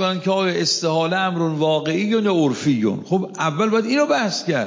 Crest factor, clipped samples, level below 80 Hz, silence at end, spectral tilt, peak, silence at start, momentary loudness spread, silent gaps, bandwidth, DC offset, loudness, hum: 14 dB; under 0.1%; -66 dBFS; 0 s; -5 dB/octave; -6 dBFS; 0 s; 3 LU; none; 7.6 kHz; under 0.1%; -19 LUFS; none